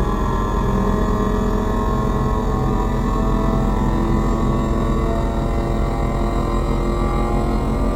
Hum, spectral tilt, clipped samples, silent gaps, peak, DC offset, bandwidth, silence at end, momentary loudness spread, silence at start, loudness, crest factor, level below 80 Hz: none; -7.5 dB/octave; under 0.1%; none; -6 dBFS; 0.3%; 15 kHz; 0 s; 2 LU; 0 s; -20 LUFS; 12 dB; -22 dBFS